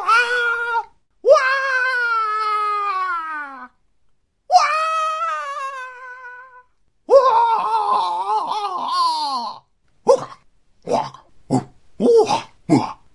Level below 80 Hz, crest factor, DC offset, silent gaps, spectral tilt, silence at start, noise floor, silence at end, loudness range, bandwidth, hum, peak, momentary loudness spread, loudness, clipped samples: -62 dBFS; 18 dB; under 0.1%; none; -4.5 dB/octave; 0 s; -64 dBFS; 0.2 s; 4 LU; 11.5 kHz; none; 0 dBFS; 17 LU; -19 LUFS; under 0.1%